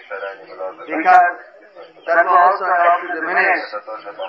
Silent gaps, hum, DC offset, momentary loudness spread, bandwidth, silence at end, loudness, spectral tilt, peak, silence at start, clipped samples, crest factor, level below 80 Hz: none; none; under 0.1%; 19 LU; 6.2 kHz; 0 s; -15 LUFS; -4.5 dB/octave; 0 dBFS; 0.1 s; under 0.1%; 18 dB; -74 dBFS